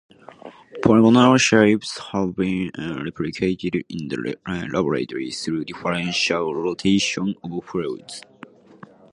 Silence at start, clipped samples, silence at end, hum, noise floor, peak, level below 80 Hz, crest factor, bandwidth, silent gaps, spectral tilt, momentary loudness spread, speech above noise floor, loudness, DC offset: 0.45 s; under 0.1%; 0.9 s; none; -46 dBFS; -2 dBFS; -52 dBFS; 20 dB; 11 kHz; none; -5 dB/octave; 15 LU; 26 dB; -21 LUFS; under 0.1%